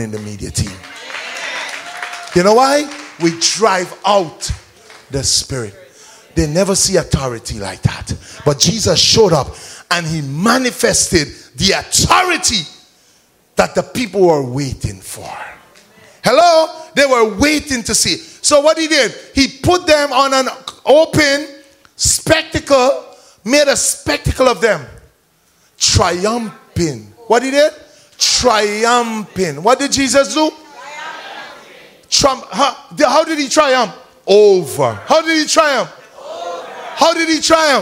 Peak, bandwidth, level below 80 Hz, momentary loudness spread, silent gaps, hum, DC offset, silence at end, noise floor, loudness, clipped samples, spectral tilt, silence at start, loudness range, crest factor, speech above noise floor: 0 dBFS; 16.5 kHz; -36 dBFS; 15 LU; none; none; under 0.1%; 0 s; -55 dBFS; -13 LUFS; under 0.1%; -3 dB/octave; 0 s; 4 LU; 14 dB; 42 dB